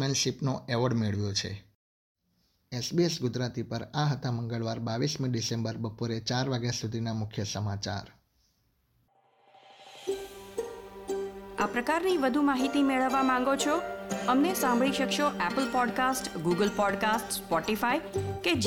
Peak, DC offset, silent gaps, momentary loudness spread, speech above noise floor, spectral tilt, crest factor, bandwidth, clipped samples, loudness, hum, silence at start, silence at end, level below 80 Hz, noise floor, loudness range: -14 dBFS; under 0.1%; 1.75-2.15 s; 10 LU; 44 dB; -4.5 dB/octave; 16 dB; 18 kHz; under 0.1%; -29 LUFS; none; 0 s; 0 s; -60 dBFS; -73 dBFS; 11 LU